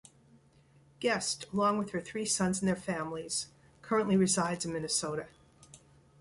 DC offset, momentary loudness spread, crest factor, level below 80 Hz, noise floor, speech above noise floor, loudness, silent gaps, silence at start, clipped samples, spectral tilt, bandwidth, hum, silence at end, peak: under 0.1%; 9 LU; 18 dB; -64 dBFS; -63 dBFS; 32 dB; -32 LUFS; none; 1 s; under 0.1%; -4 dB/octave; 11.5 kHz; none; 0.45 s; -16 dBFS